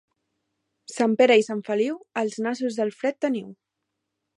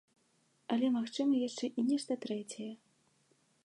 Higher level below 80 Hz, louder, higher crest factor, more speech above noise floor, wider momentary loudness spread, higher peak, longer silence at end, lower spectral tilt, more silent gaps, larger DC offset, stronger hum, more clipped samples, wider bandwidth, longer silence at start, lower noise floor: first, -80 dBFS vs -88 dBFS; first, -24 LUFS vs -35 LUFS; about the same, 20 dB vs 16 dB; first, 58 dB vs 39 dB; about the same, 11 LU vs 13 LU; first, -6 dBFS vs -20 dBFS; about the same, 0.85 s vs 0.9 s; about the same, -4.5 dB/octave vs -4.5 dB/octave; neither; neither; neither; neither; about the same, 11 kHz vs 11.5 kHz; first, 0.9 s vs 0.7 s; first, -81 dBFS vs -73 dBFS